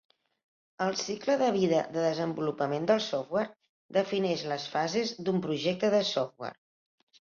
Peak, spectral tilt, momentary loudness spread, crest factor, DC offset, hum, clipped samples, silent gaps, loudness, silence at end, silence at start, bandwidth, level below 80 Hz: -12 dBFS; -5 dB/octave; 6 LU; 18 dB; under 0.1%; none; under 0.1%; 3.69-3.89 s; -30 LUFS; 0.75 s; 0.8 s; 7.4 kHz; -72 dBFS